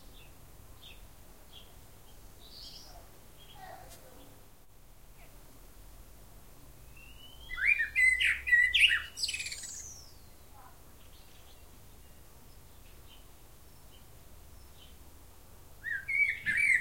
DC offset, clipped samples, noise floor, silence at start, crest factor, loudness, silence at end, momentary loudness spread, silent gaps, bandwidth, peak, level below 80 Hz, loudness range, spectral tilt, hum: 0.2%; under 0.1%; -58 dBFS; 0.05 s; 24 dB; -27 LUFS; 0 s; 29 LU; none; 16.5 kHz; -12 dBFS; -56 dBFS; 25 LU; 0 dB/octave; none